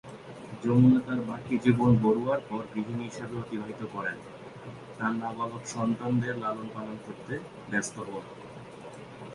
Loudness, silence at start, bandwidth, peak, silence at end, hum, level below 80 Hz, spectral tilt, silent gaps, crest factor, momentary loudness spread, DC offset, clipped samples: -29 LUFS; 0.05 s; 11.5 kHz; -8 dBFS; 0 s; none; -60 dBFS; -7 dB/octave; none; 22 dB; 22 LU; under 0.1%; under 0.1%